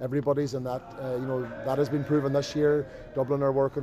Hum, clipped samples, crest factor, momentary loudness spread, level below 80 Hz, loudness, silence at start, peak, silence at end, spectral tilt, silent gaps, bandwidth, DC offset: none; under 0.1%; 14 dB; 8 LU; -56 dBFS; -28 LUFS; 0 s; -14 dBFS; 0 s; -7.5 dB/octave; none; 14 kHz; under 0.1%